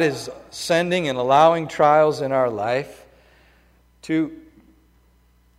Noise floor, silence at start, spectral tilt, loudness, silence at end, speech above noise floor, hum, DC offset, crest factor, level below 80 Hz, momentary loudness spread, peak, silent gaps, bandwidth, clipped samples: -57 dBFS; 0 s; -5 dB/octave; -20 LUFS; 1.2 s; 38 dB; 60 Hz at -55 dBFS; under 0.1%; 18 dB; -58 dBFS; 16 LU; -4 dBFS; none; 15.5 kHz; under 0.1%